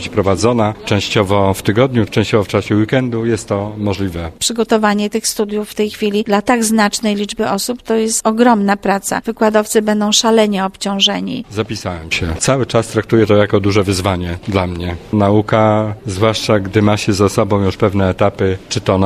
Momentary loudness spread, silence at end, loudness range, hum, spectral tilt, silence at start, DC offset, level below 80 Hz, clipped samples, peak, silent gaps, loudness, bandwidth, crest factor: 7 LU; 0 s; 2 LU; none; -5 dB/octave; 0 s; under 0.1%; -40 dBFS; under 0.1%; 0 dBFS; none; -15 LUFS; 14 kHz; 14 dB